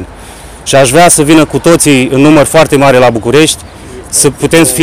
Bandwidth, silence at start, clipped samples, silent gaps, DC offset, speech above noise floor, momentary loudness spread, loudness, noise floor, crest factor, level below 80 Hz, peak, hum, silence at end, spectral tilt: over 20 kHz; 0 s; 5%; none; 3%; 22 dB; 6 LU; -6 LUFS; -28 dBFS; 6 dB; -32 dBFS; 0 dBFS; none; 0 s; -4 dB/octave